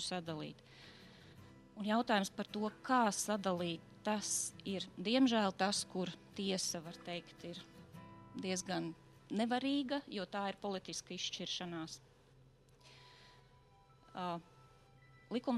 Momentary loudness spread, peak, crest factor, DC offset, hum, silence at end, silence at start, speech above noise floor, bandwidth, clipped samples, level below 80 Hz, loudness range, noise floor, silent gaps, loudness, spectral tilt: 23 LU; -18 dBFS; 22 dB; under 0.1%; none; 0 s; 0 s; 27 dB; 13.5 kHz; under 0.1%; -74 dBFS; 11 LU; -66 dBFS; none; -39 LUFS; -3.5 dB/octave